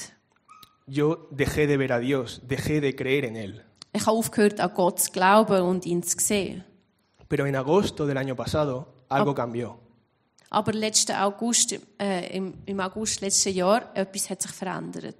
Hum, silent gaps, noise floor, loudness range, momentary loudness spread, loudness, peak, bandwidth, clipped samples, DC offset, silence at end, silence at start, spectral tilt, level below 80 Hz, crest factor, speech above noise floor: none; none; -64 dBFS; 4 LU; 11 LU; -25 LUFS; -4 dBFS; 15.5 kHz; under 0.1%; under 0.1%; 0.05 s; 0 s; -4 dB/octave; -54 dBFS; 22 dB; 39 dB